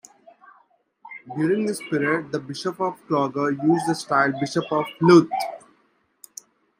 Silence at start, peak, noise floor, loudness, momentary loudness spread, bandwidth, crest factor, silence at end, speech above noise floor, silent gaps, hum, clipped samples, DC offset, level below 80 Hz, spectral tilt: 1.05 s; -2 dBFS; -65 dBFS; -22 LUFS; 26 LU; 15.5 kHz; 20 dB; 1.25 s; 43 dB; none; none; under 0.1%; under 0.1%; -70 dBFS; -6 dB/octave